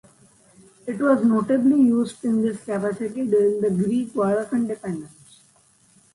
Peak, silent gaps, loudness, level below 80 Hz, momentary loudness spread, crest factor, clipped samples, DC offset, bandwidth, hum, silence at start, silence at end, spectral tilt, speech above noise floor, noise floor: -6 dBFS; none; -21 LUFS; -66 dBFS; 11 LU; 16 dB; under 0.1%; under 0.1%; 11.5 kHz; none; 0.85 s; 1.05 s; -7.5 dB/octave; 37 dB; -58 dBFS